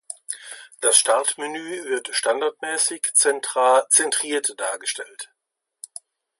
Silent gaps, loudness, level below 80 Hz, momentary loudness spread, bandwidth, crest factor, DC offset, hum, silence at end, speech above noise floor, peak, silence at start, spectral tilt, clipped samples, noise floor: none; -20 LUFS; -86 dBFS; 22 LU; 12 kHz; 22 dB; under 0.1%; none; 1.15 s; 59 dB; 0 dBFS; 0.1 s; 1 dB/octave; under 0.1%; -81 dBFS